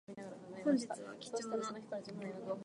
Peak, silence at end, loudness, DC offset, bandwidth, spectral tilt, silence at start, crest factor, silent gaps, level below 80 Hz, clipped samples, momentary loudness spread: -22 dBFS; 0 s; -41 LUFS; under 0.1%; 11 kHz; -5 dB/octave; 0.1 s; 20 dB; none; -84 dBFS; under 0.1%; 13 LU